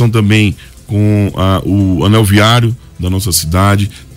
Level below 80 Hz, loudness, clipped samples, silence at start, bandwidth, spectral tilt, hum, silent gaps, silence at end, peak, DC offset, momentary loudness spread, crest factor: -32 dBFS; -11 LUFS; under 0.1%; 0 s; 16.5 kHz; -5.5 dB/octave; none; none; 0 s; 0 dBFS; under 0.1%; 9 LU; 10 dB